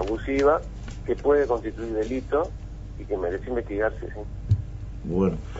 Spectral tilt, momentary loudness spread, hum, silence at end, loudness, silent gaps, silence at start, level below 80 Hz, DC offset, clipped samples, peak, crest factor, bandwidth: -8 dB/octave; 15 LU; 50 Hz at -40 dBFS; 0 s; -26 LUFS; none; 0 s; -38 dBFS; under 0.1%; under 0.1%; -8 dBFS; 18 dB; 8 kHz